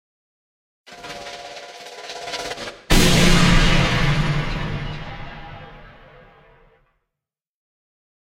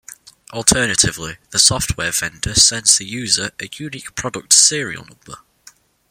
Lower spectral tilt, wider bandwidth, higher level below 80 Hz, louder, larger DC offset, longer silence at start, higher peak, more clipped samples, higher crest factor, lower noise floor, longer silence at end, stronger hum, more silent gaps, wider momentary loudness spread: first, -4.5 dB/octave vs -1 dB/octave; second, 16 kHz vs over 20 kHz; first, -26 dBFS vs -40 dBFS; second, -19 LUFS vs -14 LUFS; neither; first, 0.9 s vs 0.1 s; about the same, -2 dBFS vs 0 dBFS; neither; about the same, 18 dB vs 18 dB; first, -87 dBFS vs -49 dBFS; first, 2.4 s vs 0.75 s; neither; neither; first, 22 LU vs 18 LU